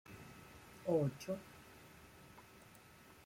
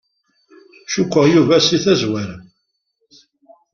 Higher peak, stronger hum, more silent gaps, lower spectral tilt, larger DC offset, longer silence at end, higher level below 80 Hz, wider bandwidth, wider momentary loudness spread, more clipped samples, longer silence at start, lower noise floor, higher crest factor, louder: second, -24 dBFS vs -2 dBFS; neither; neither; first, -7 dB/octave vs -5 dB/octave; neither; second, 0.85 s vs 1.3 s; second, -72 dBFS vs -54 dBFS; first, 16.5 kHz vs 7.2 kHz; first, 23 LU vs 13 LU; neither; second, 0.1 s vs 0.9 s; second, -62 dBFS vs -71 dBFS; about the same, 22 dB vs 18 dB; second, -40 LUFS vs -15 LUFS